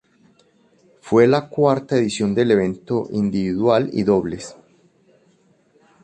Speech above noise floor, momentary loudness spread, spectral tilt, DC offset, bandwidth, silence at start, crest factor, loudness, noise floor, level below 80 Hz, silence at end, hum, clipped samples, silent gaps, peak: 40 dB; 8 LU; -6.5 dB/octave; under 0.1%; 9 kHz; 1.05 s; 18 dB; -19 LUFS; -58 dBFS; -54 dBFS; 1.5 s; none; under 0.1%; none; -2 dBFS